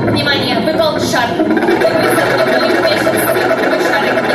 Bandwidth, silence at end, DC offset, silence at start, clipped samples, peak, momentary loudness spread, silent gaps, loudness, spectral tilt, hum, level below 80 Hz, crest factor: 15 kHz; 0 s; under 0.1%; 0 s; under 0.1%; 0 dBFS; 2 LU; none; -12 LUFS; -4.5 dB/octave; none; -46 dBFS; 12 dB